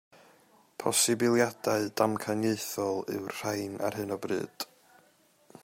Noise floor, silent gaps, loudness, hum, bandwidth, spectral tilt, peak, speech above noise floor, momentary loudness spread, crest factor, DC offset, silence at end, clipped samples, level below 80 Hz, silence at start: -65 dBFS; none; -30 LUFS; none; 16 kHz; -3.5 dB/octave; -12 dBFS; 35 dB; 11 LU; 20 dB; under 0.1%; 0.05 s; under 0.1%; -74 dBFS; 0.8 s